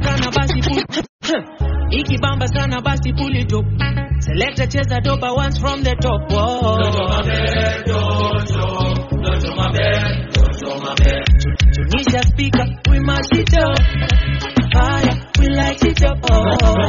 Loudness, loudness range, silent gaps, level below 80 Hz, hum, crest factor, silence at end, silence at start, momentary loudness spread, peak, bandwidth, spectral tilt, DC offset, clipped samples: -17 LUFS; 3 LU; 1.09-1.19 s; -20 dBFS; none; 14 dB; 0 s; 0 s; 5 LU; 0 dBFS; 7.4 kHz; -5 dB/octave; under 0.1%; under 0.1%